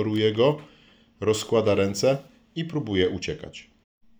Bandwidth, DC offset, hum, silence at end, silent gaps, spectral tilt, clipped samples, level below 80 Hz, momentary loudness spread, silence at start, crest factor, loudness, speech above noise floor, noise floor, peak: over 20 kHz; under 0.1%; none; 0.6 s; none; -5.5 dB/octave; under 0.1%; -60 dBFS; 15 LU; 0 s; 18 dB; -25 LUFS; 32 dB; -56 dBFS; -8 dBFS